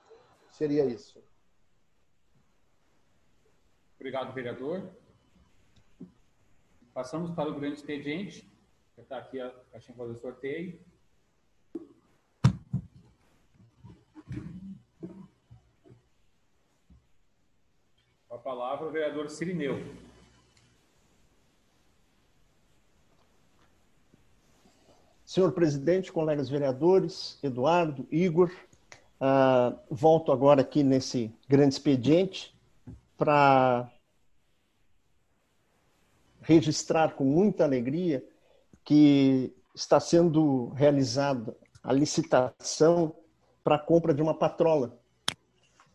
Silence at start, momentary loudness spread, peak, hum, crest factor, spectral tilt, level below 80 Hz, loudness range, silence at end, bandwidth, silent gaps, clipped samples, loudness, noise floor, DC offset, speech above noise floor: 0.6 s; 21 LU; -8 dBFS; none; 22 dB; -6.5 dB/octave; -62 dBFS; 17 LU; 0.6 s; 11.5 kHz; none; under 0.1%; -27 LUFS; -74 dBFS; under 0.1%; 48 dB